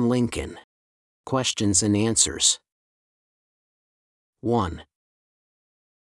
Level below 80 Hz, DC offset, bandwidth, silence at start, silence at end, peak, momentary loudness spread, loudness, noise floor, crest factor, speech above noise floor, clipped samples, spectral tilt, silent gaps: -52 dBFS; under 0.1%; 12 kHz; 0 s; 1.3 s; -4 dBFS; 14 LU; -22 LUFS; under -90 dBFS; 22 dB; over 67 dB; under 0.1%; -3.5 dB/octave; 0.64-1.24 s, 2.72-4.33 s